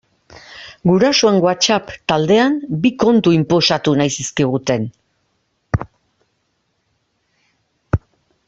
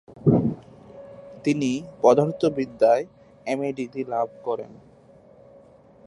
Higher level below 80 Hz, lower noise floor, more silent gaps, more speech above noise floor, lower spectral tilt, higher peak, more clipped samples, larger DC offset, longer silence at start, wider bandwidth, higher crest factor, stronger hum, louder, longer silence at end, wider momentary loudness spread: first, -42 dBFS vs -58 dBFS; first, -67 dBFS vs -52 dBFS; neither; first, 53 dB vs 29 dB; second, -5 dB/octave vs -7.5 dB/octave; first, 0 dBFS vs -4 dBFS; neither; neither; first, 0.5 s vs 0.1 s; second, 8.2 kHz vs 11.5 kHz; about the same, 18 dB vs 20 dB; neither; first, -16 LUFS vs -23 LUFS; second, 0.5 s vs 1.35 s; second, 11 LU vs 22 LU